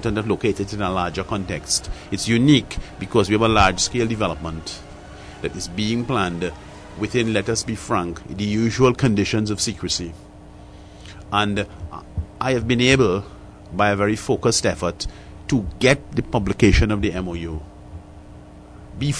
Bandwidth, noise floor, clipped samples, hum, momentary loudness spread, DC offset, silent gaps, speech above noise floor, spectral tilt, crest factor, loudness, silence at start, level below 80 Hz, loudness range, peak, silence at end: 11 kHz; -41 dBFS; under 0.1%; none; 19 LU; under 0.1%; none; 21 dB; -4.5 dB/octave; 18 dB; -21 LUFS; 0 s; -36 dBFS; 5 LU; -4 dBFS; 0 s